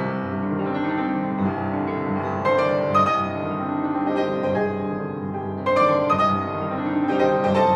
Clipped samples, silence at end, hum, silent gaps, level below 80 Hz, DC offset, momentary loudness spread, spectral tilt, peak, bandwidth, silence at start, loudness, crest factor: under 0.1%; 0 s; none; none; -58 dBFS; under 0.1%; 7 LU; -7.5 dB/octave; -6 dBFS; 8.8 kHz; 0 s; -22 LUFS; 16 dB